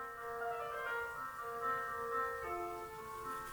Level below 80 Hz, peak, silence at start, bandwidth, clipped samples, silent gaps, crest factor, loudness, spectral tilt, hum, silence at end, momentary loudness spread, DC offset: -66 dBFS; -26 dBFS; 0 s; over 20 kHz; under 0.1%; none; 16 dB; -41 LUFS; -4 dB/octave; none; 0 s; 6 LU; under 0.1%